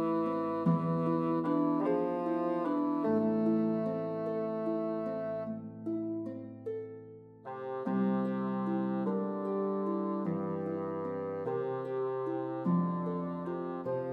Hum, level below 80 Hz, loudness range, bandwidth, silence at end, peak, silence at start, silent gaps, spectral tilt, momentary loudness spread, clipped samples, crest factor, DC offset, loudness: none; -76 dBFS; 6 LU; 5.2 kHz; 0 s; -18 dBFS; 0 s; none; -10.5 dB/octave; 10 LU; under 0.1%; 16 dB; under 0.1%; -33 LUFS